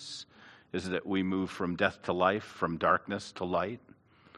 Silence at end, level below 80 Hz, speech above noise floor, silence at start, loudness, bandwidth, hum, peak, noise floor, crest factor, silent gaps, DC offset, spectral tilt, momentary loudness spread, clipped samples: 0 s; -70 dBFS; 26 dB; 0 s; -32 LUFS; 12 kHz; none; -10 dBFS; -57 dBFS; 22 dB; none; under 0.1%; -5.5 dB/octave; 13 LU; under 0.1%